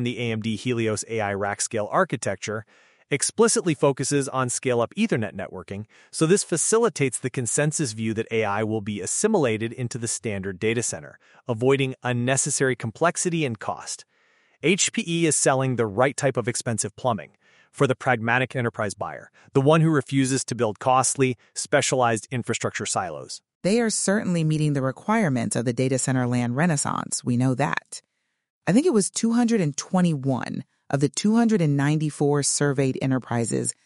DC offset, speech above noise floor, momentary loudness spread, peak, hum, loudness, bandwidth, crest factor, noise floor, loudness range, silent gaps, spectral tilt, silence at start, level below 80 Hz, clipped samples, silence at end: under 0.1%; 39 dB; 10 LU; -4 dBFS; none; -23 LUFS; 11.5 kHz; 20 dB; -63 dBFS; 2 LU; 23.55-23.61 s, 28.50-28.61 s; -4.5 dB/octave; 0 s; -64 dBFS; under 0.1%; 0.15 s